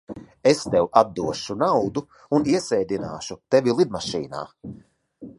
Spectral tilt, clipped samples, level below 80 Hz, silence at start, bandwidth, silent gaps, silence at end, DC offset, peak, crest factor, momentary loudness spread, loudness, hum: -5.5 dB/octave; under 0.1%; -56 dBFS; 0.1 s; 11.5 kHz; none; 0.05 s; under 0.1%; -2 dBFS; 22 dB; 15 LU; -22 LUFS; none